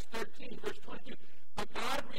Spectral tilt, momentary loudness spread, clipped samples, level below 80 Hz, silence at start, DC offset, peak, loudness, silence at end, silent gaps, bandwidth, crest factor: -3.5 dB/octave; 13 LU; under 0.1%; -58 dBFS; 0 s; 4%; -20 dBFS; -42 LUFS; 0 s; none; 16 kHz; 20 dB